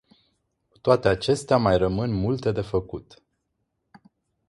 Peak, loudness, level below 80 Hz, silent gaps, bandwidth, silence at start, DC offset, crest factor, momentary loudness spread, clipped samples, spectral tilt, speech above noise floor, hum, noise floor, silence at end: -4 dBFS; -23 LUFS; -46 dBFS; none; 11.5 kHz; 0.85 s; under 0.1%; 22 dB; 8 LU; under 0.1%; -6.5 dB/octave; 54 dB; none; -77 dBFS; 1.45 s